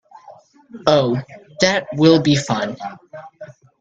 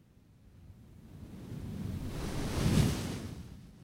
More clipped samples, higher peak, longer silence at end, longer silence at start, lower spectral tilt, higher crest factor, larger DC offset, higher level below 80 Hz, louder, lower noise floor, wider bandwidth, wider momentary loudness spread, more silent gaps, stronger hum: neither; first, 0 dBFS vs -14 dBFS; first, 0.3 s vs 0 s; about the same, 0.3 s vs 0.3 s; about the same, -5.5 dB/octave vs -6 dB/octave; about the same, 20 dB vs 22 dB; neither; second, -54 dBFS vs -46 dBFS; first, -17 LUFS vs -35 LUFS; second, -45 dBFS vs -60 dBFS; second, 8 kHz vs 16 kHz; about the same, 24 LU vs 26 LU; neither; neither